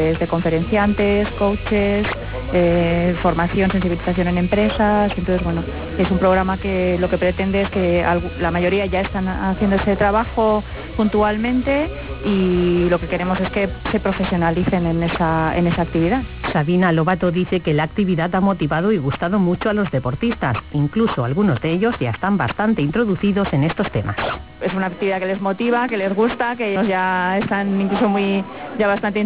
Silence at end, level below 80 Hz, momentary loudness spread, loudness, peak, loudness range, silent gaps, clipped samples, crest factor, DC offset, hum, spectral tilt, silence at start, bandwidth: 0 s; -34 dBFS; 5 LU; -19 LUFS; -4 dBFS; 2 LU; none; under 0.1%; 14 dB; 0.4%; none; -11 dB/octave; 0 s; 4 kHz